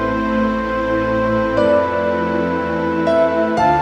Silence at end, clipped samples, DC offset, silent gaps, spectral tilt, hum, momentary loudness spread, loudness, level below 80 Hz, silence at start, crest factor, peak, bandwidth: 0 s; under 0.1%; under 0.1%; none; -7 dB/octave; none; 4 LU; -17 LUFS; -38 dBFS; 0 s; 14 dB; -4 dBFS; 9.4 kHz